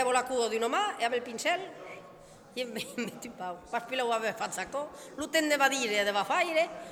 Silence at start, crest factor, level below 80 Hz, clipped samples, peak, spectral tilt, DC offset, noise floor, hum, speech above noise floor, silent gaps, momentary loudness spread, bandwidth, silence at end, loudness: 0 s; 22 dB; -70 dBFS; under 0.1%; -10 dBFS; -2 dB/octave; under 0.1%; -53 dBFS; none; 21 dB; none; 14 LU; 18.5 kHz; 0 s; -30 LUFS